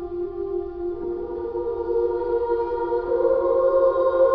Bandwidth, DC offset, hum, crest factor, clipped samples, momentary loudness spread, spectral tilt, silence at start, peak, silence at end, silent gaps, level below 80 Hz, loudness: 5.4 kHz; under 0.1%; none; 14 dB; under 0.1%; 10 LU; -9.5 dB/octave; 0 s; -8 dBFS; 0 s; none; -46 dBFS; -23 LUFS